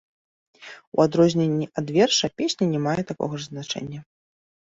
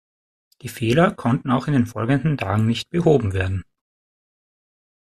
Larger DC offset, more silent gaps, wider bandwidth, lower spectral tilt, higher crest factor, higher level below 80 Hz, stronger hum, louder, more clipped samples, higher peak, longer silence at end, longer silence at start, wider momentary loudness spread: neither; first, 0.87-0.92 s vs none; second, 7.8 kHz vs 14 kHz; second, -5 dB/octave vs -7 dB/octave; about the same, 20 dB vs 18 dB; second, -60 dBFS vs -50 dBFS; neither; second, -23 LUFS vs -20 LUFS; neither; about the same, -4 dBFS vs -2 dBFS; second, 0.7 s vs 1.55 s; about the same, 0.6 s vs 0.65 s; first, 16 LU vs 9 LU